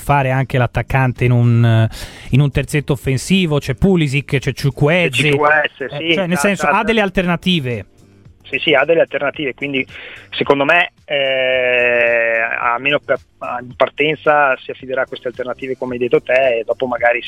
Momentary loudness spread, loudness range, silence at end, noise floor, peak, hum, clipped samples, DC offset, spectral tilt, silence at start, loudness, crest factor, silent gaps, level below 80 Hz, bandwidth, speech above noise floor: 10 LU; 3 LU; 0 s; -45 dBFS; 0 dBFS; none; under 0.1%; under 0.1%; -6 dB/octave; 0 s; -15 LUFS; 16 dB; none; -38 dBFS; 15 kHz; 30 dB